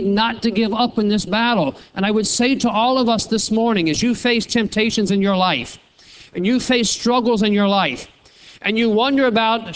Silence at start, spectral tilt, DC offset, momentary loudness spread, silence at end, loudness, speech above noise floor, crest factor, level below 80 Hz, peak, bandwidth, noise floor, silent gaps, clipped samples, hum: 0 s; -4 dB/octave; under 0.1%; 6 LU; 0 s; -17 LUFS; 28 dB; 16 dB; -48 dBFS; -2 dBFS; 8 kHz; -45 dBFS; none; under 0.1%; none